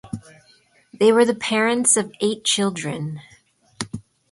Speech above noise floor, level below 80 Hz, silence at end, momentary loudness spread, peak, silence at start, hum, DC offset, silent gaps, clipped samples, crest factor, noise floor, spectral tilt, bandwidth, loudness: 37 dB; -60 dBFS; 0.3 s; 20 LU; -4 dBFS; 0.05 s; none; under 0.1%; none; under 0.1%; 18 dB; -57 dBFS; -3 dB/octave; 11.5 kHz; -19 LUFS